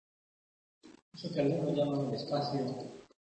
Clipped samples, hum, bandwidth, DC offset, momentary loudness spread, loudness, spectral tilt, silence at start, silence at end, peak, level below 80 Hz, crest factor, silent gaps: under 0.1%; none; 8.4 kHz; under 0.1%; 13 LU; -34 LUFS; -7.5 dB/octave; 0.85 s; 0.25 s; -18 dBFS; -72 dBFS; 16 dB; 1.02-1.12 s